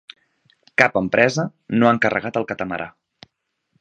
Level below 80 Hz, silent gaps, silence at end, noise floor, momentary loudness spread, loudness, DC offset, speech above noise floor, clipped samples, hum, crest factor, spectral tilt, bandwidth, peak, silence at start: -58 dBFS; none; 0.9 s; -72 dBFS; 11 LU; -19 LUFS; under 0.1%; 53 dB; under 0.1%; none; 22 dB; -5.5 dB/octave; 8.8 kHz; 0 dBFS; 0.8 s